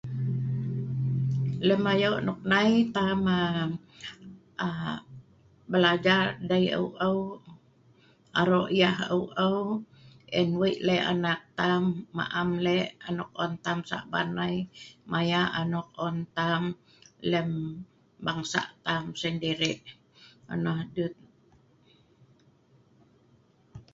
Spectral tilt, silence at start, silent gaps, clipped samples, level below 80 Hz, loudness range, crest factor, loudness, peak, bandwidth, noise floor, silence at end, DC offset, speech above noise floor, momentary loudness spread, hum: -6 dB/octave; 0.05 s; none; under 0.1%; -62 dBFS; 6 LU; 22 dB; -28 LUFS; -8 dBFS; 7.8 kHz; -63 dBFS; 0.15 s; under 0.1%; 35 dB; 11 LU; none